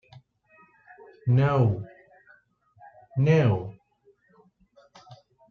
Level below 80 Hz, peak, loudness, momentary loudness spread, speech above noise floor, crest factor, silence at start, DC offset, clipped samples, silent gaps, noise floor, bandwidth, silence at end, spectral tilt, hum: -60 dBFS; -10 dBFS; -24 LUFS; 15 LU; 42 dB; 18 dB; 1.25 s; under 0.1%; under 0.1%; none; -64 dBFS; 6.6 kHz; 0.35 s; -9 dB/octave; none